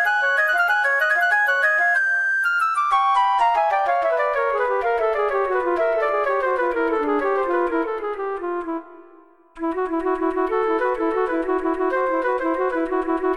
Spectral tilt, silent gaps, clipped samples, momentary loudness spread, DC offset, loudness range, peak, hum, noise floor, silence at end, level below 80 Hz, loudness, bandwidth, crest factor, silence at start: -3.5 dB/octave; none; under 0.1%; 7 LU; 0.3%; 7 LU; -8 dBFS; none; -50 dBFS; 0 s; -52 dBFS; -20 LUFS; 13.5 kHz; 12 dB; 0 s